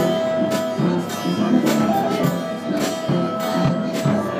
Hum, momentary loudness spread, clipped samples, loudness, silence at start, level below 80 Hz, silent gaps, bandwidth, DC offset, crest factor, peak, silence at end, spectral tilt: none; 5 LU; under 0.1%; -20 LUFS; 0 s; -58 dBFS; none; 15.5 kHz; under 0.1%; 14 dB; -4 dBFS; 0 s; -6 dB/octave